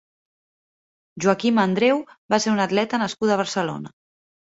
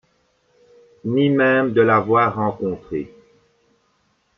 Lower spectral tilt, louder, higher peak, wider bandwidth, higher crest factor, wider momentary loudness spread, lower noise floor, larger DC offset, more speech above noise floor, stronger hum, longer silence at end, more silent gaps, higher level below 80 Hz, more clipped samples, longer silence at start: second, -5 dB/octave vs -9 dB/octave; second, -21 LUFS vs -18 LUFS; about the same, -4 dBFS vs -4 dBFS; first, 8 kHz vs 6 kHz; about the same, 20 dB vs 18 dB; second, 7 LU vs 14 LU; first, under -90 dBFS vs -65 dBFS; neither; first, over 69 dB vs 47 dB; neither; second, 0.7 s vs 1.3 s; first, 2.18-2.29 s vs none; second, -64 dBFS vs -58 dBFS; neither; about the same, 1.15 s vs 1.05 s